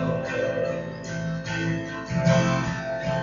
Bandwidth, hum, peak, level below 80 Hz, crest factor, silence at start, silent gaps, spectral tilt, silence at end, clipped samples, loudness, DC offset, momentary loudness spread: 7.4 kHz; none; -8 dBFS; -48 dBFS; 18 dB; 0 s; none; -6 dB/octave; 0 s; under 0.1%; -26 LUFS; under 0.1%; 9 LU